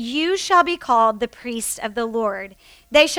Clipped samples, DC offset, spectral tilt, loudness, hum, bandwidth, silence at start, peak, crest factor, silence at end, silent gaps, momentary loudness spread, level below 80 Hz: under 0.1%; under 0.1%; -2 dB/octave; -20 LUFS; none; 18 kHz; 0 s; -2 dBFS; 18 dB; 0 s; none; 10 LU; -52 dBFS